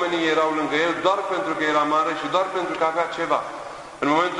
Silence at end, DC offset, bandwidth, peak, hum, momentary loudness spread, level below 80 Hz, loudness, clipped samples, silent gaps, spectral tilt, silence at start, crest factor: 0 s; under 0.1%; 11 kHz; -6 dBFS; none; 5 LU; -62 dBFS; -22 LUFS; under 0.1%; none; -4 dB/octave; 0 s; 16 dB